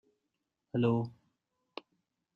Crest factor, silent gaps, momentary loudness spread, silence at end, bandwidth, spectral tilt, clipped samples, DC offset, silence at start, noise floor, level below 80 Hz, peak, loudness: 20 dB; none; 20 LU; 1.25 s; 5.6 kHz; -9.5 dB/octave; under 0.1%; under 0.1%; 0.75 s; -85 dBFS; -72 dBFS; -16 dBFS; -33 LUFS